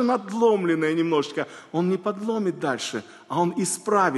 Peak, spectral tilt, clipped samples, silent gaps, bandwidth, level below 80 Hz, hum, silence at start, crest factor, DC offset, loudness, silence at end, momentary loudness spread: -8 dBFS; -5 dB/octave; under 0.1%; none; 12.5 kHz; -74 dBFS; none; 0 s; 16 dB; under 0.1%; -24 LUFS; 0 s; 9 LU